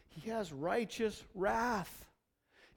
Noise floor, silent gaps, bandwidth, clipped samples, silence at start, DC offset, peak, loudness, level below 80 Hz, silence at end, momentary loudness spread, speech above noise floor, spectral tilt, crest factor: -74 dBFS; none; 19 kHz; under 0.1%; 0.1 s; under 0.1%; -20 dBFS; -37 LUFS; -62 dBFS; 0.7 s; 8 LU; 37 dB; -5 dB/octave; 18 dB